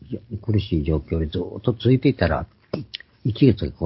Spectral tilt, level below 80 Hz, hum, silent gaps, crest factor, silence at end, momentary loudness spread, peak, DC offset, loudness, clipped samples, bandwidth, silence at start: -12 dB/octave; -34 dBFS; none; none; 18 dB; 0 s; 13 LU; -4 dBFS; under 0.1%; -22 LUFS; under 0.1%; 5.8 kHz; 0.1 s